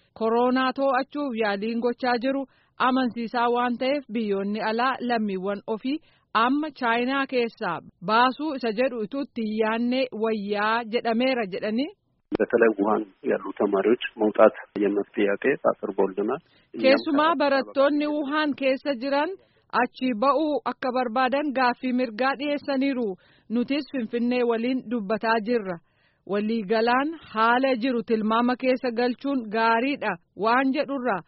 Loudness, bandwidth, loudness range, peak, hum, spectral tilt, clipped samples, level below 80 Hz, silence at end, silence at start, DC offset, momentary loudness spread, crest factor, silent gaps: -25 LUFS; 5.8 kHz; 3 LU; -4 dBFS; none; -3 dB/octave; under 0.1%; -68 dBFS; 0.05 s; 0.2 s; under 0.1%; 8 LU; 20 dB; none